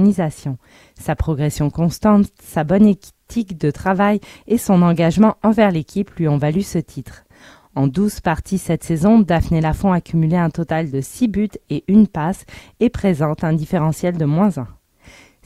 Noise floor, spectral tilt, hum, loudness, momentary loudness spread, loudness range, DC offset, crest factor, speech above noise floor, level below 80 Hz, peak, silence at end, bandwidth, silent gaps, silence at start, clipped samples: -46 dBFS; -7.5 dB/octave; none; -17 LUFS; 11 LU; 3 LU; under 0.1%; 16 dB; 30 dB; -38 dBFS; 0 dBFS; 0.75 s; 14.5 kHz; none; 0 s; under 0.1%